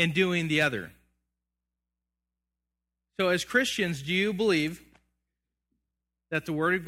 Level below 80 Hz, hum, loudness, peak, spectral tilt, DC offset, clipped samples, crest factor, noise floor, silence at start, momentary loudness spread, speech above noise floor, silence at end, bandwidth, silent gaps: -62 dBFS; 60 Hz at -55 dBFS; -27 LUFS; -10 dBFS; -4.5 dB/octave; under 0.1%; under 0.1%; 22 dB; -87 dBFS; 0 s; 12 LU; 60 dB; 0 s; 16.5 kHz; none